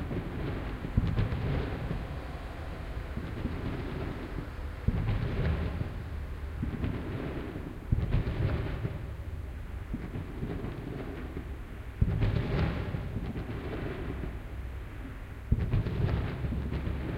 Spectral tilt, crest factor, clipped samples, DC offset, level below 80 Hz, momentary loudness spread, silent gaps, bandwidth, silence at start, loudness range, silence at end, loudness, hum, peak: -8.5 dB/octave; 20 dB; under 0.1%; under 0.1%; -38 dBFS; 10 LU; none; 15.5 kHz; 0 s; 3 LU; 0 s; -35 LUFS; none; -12 dBFS